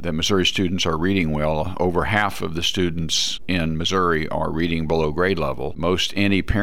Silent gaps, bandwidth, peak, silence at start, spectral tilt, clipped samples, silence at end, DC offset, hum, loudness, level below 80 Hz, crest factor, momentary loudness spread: none; 16.5 kHz; -6 dBFS; 0 s; -4.5 dB/octave; under 0.1%; 0 s; 3%; none; -21 LUFS; -36 dBFS; 16 dB; 4 LU